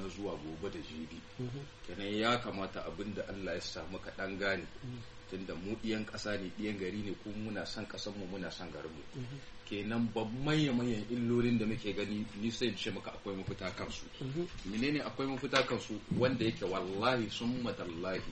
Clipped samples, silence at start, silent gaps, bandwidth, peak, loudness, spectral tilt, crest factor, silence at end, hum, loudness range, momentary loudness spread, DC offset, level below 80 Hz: under 0.1%; 0 s; none; 8.4 kHz; -18 dBFS; -37 LUFS; -5.5 dB/octave; 20 dB; 0 s; none; 6 LU; 13 LU; under 0.1%; -56 dBFS